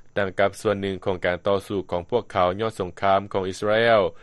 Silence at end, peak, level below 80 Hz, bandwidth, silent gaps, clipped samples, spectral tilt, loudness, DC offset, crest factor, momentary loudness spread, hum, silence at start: 0.05 s; -6 dBFS; -54 dBFS; 12 kHz; none; under 0.1%; -5.5 dB/octave; -23 LUFS; under 0.1%; 18 dB; 8 LU; none; 0.05 s